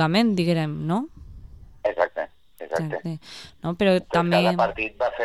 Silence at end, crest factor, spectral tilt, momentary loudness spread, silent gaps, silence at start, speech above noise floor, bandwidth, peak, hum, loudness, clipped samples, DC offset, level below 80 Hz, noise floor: 0 s; 18 dB; -6.5 dB/octave; 15 LU; none; 0 s; 21 dB; 13 kHz; -6 dBFS; none; -24 LUFS; under 0.1%; 0.2%; -50 dBFS; -44 dBFS